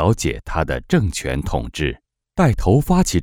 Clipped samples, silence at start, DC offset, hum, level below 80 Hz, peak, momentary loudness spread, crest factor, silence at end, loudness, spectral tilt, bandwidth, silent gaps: under 0.1%; 0 s; under 0.1%; none; -28 dBFS; -2 dBFS; 9 LU; 16 dB; 0 s; -20 LUFS; -6 dB/octave; over 20 kHz; none